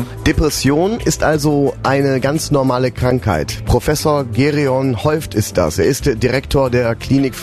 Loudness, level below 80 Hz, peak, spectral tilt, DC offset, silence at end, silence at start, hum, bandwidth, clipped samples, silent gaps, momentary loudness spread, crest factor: -16 LUFS; -30 dBFS; -2 dBFS; -5.5 dB/octave; under 0.1%; 0 s; 0 s; none; 13.5 kHz; under 0.1%; none; 3 LU; 14 dB